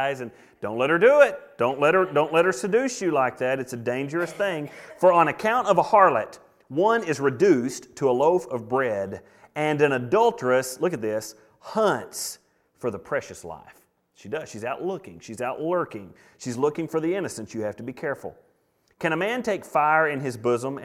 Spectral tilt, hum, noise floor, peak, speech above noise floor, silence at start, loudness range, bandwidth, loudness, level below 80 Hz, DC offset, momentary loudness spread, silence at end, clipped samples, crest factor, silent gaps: -5 dB/octave; none; -66 dBFS; -4 dBFS; 43 dB; 0 s; 9 LU; 15.5 kHz; -24 LUFS; -66 dBFS; under 0.1%; 15 LU; 0 s; under 0.1%; 20 dB; none